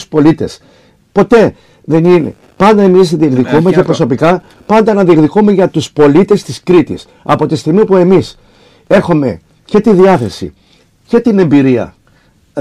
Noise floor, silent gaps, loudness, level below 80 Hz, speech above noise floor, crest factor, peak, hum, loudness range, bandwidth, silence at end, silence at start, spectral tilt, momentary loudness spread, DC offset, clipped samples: -48 dBFS; none; -9 LUFS; -42 dBFS; 40 dB; 10 dB; 0 dBFS; none; 2 LU; 12 kHz; 0 s; 0 s; -7.5 dB/octave; 11 LU; 0.6%; under 0.1%